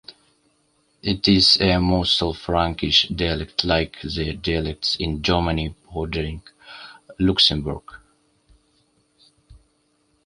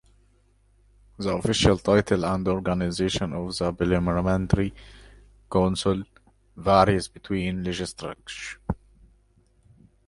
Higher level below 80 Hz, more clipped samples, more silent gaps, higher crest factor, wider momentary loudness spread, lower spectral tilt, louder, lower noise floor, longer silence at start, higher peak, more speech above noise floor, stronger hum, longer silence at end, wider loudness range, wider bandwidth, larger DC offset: first, -36 dBFS vs -42 dBFS; neither; neither; about the same, 20 dB vs 22 dB; about the same, 16 LU vs 14 LU; about the same, -5 dB/octave vs -5.5 dB/octave; first, -20 LUFS vs -25 LUFS; about the same, -65 dBFS vs -62 dBFS; second, 0.1 s vs 1.2 s; about the same, -2 dBFS vs -4 dBFS; first, 44 dB vs 37 dB; neither; second, 0.7 s vs 1.3 s; first, 6 LU vs 3 LU; about the same, 11.5 kHz vs 11.5 kHz; neither